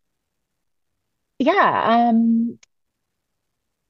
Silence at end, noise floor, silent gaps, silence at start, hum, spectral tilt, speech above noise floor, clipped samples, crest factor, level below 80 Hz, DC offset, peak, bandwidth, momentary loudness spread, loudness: 1.35 s; -78 dBFS; none; 1.4 s; none; -7 dB/octave; 61 dB; under 0.1%; 18 dB; -70 dBFS; under 0.1%; -4 dBFS; 6.4 kHz; 6 LU; -18 LUFS